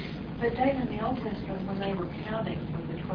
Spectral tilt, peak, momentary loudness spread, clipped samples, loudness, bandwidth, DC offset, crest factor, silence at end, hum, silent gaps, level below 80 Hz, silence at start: -9.5 dB/octave; -14 dBFS; 7 LU; under 0.1%; -32 LUFS; 5.4 kHz; under 0.1%; 18 dB; 0 s; none; none; -48 dBFS; 0 s